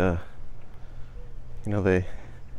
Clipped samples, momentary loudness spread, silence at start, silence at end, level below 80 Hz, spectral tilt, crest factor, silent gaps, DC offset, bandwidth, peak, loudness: under 0.1%; 24 LU; 0 s; 0 s; -40 dBFS; -8 dB/octave; 18 dB; none; under 0.1%; 10 kHz; -10 dBFS; -28 LUFS